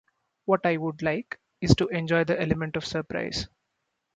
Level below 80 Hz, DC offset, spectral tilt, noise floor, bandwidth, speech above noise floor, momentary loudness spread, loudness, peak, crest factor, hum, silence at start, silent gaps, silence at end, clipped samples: -48 dBFS; under 0.1%; -6 dB/octave; -79 dBFS; 9.2 kHz; 53 dB; 10 LU; -27 LUFS; -2 dBFS; 24 dB; none; 0.45 s; none; 0.7 s; under 0.1%